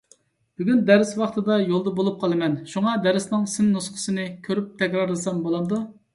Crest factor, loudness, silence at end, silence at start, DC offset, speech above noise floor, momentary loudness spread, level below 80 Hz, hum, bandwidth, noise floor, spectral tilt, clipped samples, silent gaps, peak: 20 dB; -23 LUFS; 0.25 s; 0.6 s; under 0.1%; 37 dB; 9 LU; -64 dBFS; none; 11.5 kHz; -59 dBFS; -5.5 dB/octave; under 0.1%; none; -2 dBFS